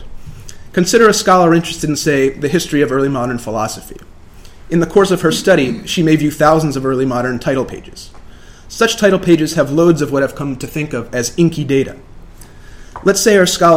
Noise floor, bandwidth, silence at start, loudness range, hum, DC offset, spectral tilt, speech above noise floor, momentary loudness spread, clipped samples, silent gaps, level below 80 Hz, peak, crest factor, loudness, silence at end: -36 dBFS; 16.5 kHz; 0 s; 3 LU; none; under 0.1%; -5 dB/octave; 23 dB; 11 LU; under 0.1%; none; -38 dBFS; 0 dBFS; 14 dB; -14 LUFS; 0 s